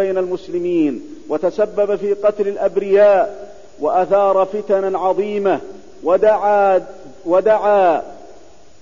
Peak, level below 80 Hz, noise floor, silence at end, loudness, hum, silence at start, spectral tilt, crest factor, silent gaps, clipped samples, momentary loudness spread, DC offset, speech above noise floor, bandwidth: -4 dBFS; -56 dBFS; -46 dBFS; 0.5 s; -16 LUFS; none; 0 s; -7 dB/octave; 12 dB; none; under 0.1%; 11 LU; 1%; 30 dB; 7.4 kHz